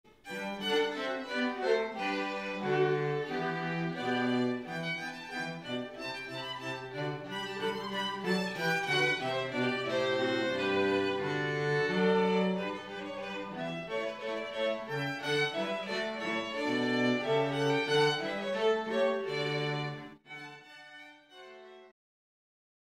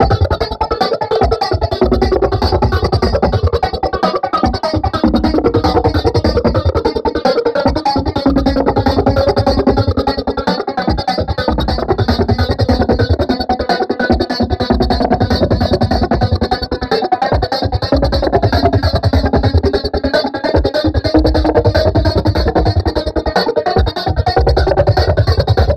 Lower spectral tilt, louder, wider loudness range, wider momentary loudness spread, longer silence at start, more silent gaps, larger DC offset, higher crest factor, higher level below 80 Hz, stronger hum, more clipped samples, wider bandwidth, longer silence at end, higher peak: second, -5 dB/octave vs -7.5 dB/octave; second, -32 LUFS vs -14 LUFS; first, 6 LU vs 1 LU; first, 11 LU vs 4 LU; first, 0.25 s vs 0 s; neither; neither; about the same, 16 dB vs 12 dB; second, -72 dBFS vs -22 dBFS; neither; neither; about the same, 14.5 kHz vs 13.5 kHz; first, 1.1 s vs 0 s; second, -16 dBFS vs 0 dBFS